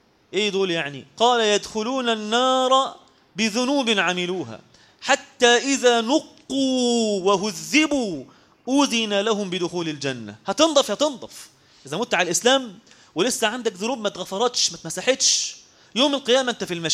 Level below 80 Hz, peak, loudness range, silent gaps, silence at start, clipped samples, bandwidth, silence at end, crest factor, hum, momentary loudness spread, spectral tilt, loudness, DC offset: -64 dBFS; -2 dBFS; 3 LU; none; 0.35 s; under 0.1%; 15.5 kHz; 0 s; 20 dB; none; 11 LU; -2.5 dB/octave; -21 LUFS; under 0.1%